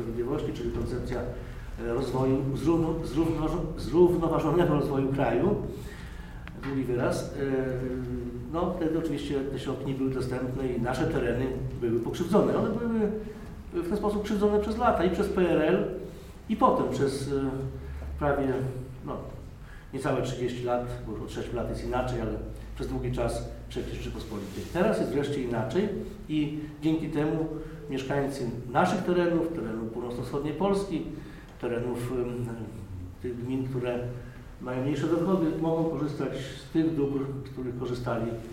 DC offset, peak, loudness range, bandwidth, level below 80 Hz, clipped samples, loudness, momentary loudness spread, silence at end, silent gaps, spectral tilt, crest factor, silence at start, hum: under 0.1%; -10 dBFS; 6 LU; 16 kHz; -44 dBFS; under 0.1%; -29 LUFS; 13 LU; 0 s; none; -7.5 dB/octave; 20 dB; 0 s; none